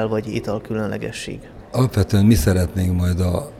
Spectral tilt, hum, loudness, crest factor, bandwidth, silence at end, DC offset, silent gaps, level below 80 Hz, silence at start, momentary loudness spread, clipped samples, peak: -6.5 dB/octave; none; -20 LUFS; 16 dB; 15.5 kHz; 0 s; under 0.1%; none; -34 dBFS; 0 s; 13 LU; under 0.1%; -4 dBFS